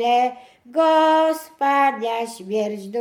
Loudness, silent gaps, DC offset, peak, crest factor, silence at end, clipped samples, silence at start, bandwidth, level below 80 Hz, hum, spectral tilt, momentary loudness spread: -20 LUFS; none; under 0.1%; -6 dBFS; 14 dB; 0 s; under 0.1%; 0 s; 18 kHz; -76 dBFS; none; -4 dB/octave; 10 LU